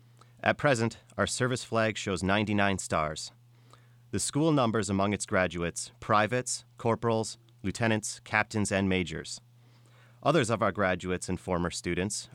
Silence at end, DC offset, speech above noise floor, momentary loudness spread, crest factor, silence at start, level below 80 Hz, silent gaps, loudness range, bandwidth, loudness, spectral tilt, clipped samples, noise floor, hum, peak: 0.1 s; under 0.1%; 29 dB; 9 LU; 22 dB; 0.45 s; -58 dBFS; none; 2 LU; 16 kHz; -29 LUFS; -4.5 dB/octave; under 0.1%; -58 dBFS; none; -8 dBFS